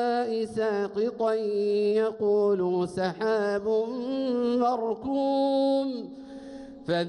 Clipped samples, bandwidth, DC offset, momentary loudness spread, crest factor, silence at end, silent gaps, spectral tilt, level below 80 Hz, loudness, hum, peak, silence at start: under 0.1%; 11 kHz; under 0.1%; 10 LU; 12 dB; 0 s; none; -6.5 dB/octave; -64 dBFS; -27 LUFS; none; -14 dBFS; 0 s